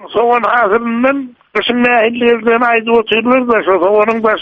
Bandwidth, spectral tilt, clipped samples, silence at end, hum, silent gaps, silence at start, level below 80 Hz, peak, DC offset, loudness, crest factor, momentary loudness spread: 5.4 kHz; -6.5 dB/octave; under 0.1%; 0 s; none; none; 0 s; -50 dBFS; 0 dBFS; under 0.1%; -12 LUFS; 12 dB; 4 LU